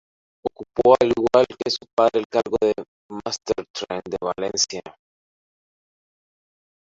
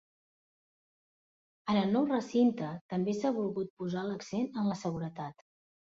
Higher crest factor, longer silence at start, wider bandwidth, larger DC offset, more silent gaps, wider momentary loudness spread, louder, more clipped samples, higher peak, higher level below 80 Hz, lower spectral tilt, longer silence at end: about the same, 22 dB vs 18 dB; second, 0.45 s vs 1.65 s; about the same, 7.8 kHz vs 7.8 kHz; neither; first, 1.93-1.97 s, 2.25-2.30 s, 2.88-3.09 s, 3.70-3.74 s vs 2.81-2.89 s, 3.70-3.77 s; first, 15 LU vs 11 LU; first, -22 LUFS vs -33 LUFS; neither; first, -2 dBFS vs -16 dBFS; first, -56 dBFS vs -72 dBFS; second, -3.5 dB/octave vs -7 dB/octave; first, 2 s vs 0.55 s